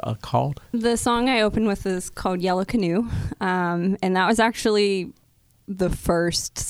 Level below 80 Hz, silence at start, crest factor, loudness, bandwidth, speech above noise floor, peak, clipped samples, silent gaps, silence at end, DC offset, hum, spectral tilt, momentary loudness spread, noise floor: -40 dBFS; 0.05 s; 18 dB; -22 LUFS; 16 kHz; 32 dB; -6 dBFS; under 0.1%; none; 0 s; under 0.1%; none; -5 dB/octave; 7 LU; -54 dBFS